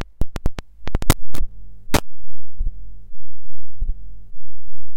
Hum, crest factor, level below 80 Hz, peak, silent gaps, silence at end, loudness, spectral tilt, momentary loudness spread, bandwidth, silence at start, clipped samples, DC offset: none; 12 dB; -26 dBFS; -2 dBFS; none; 0 s; -27 LUFS; -4.5 dB/octave; 24 LU; 17 kHz; 0 s; under 0.1%; 20%